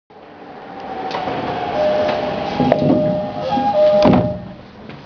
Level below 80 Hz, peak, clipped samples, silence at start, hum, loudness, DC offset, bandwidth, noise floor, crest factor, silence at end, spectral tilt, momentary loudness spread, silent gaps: -44 dBFS; 0 dBFS; under 0.1%; 0.15 s; none; -17 LUFS; under 0.1%; 5.4 kHz; -37 dBFS; 18 dB; 0 s; -8 dB/octave; 22 LU; none